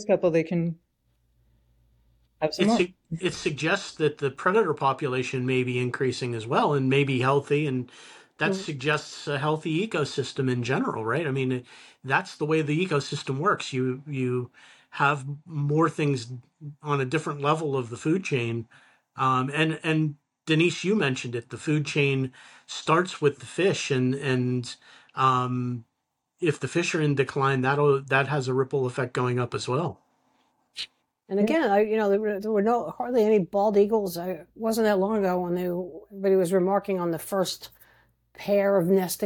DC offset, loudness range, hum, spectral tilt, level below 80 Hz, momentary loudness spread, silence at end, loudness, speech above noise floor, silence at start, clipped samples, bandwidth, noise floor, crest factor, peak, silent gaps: under 0.1%; 3 LU; none; -6 dB/octave; -66 dBFS; 10 LU; 0 s; -26 LUFS; 54 dB; 0 s; under 0.1%; 17.5 kHz; -79 dBFS; 18 dB; -8 dBFS; none